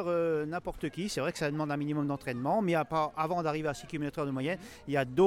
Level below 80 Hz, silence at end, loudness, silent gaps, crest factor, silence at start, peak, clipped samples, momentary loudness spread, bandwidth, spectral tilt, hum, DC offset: -58 dBFS; 0 s; -33 LUFS; none; 18 dB; 0 s; -14 dBFS; under 0.1%; 7 LU; 16.5 kHz; -6 dB/octave; none; under 0.1%